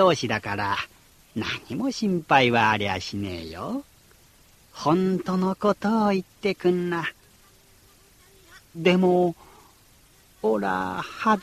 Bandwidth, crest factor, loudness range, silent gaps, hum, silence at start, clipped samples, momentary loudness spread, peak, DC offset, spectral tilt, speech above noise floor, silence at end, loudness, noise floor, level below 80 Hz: 14 kHz; 22 dB; 3 LU; none; none; 0 s; under 0.1%; 13 LU; -4 dBFS; under 0.1%; -6 dB/octave; 32 dB; 0 s; -24 LUFS; -56 dBFS; -58 dBFS